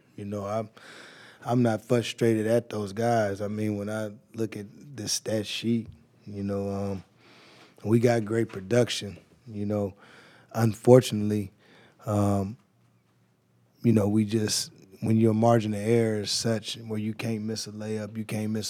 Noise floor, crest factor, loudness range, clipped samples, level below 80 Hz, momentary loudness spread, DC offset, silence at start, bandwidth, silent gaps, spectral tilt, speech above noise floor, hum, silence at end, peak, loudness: -66 dBFS; 24 dB; 6 LU; under 0.1%; -72 dBFS; 15 LU; under 0.1%; 0.2 s; 16 kHz; none; -5.5 dB/octave; 40 dB; none; 0 s; -4 dBFS; -27 LUFS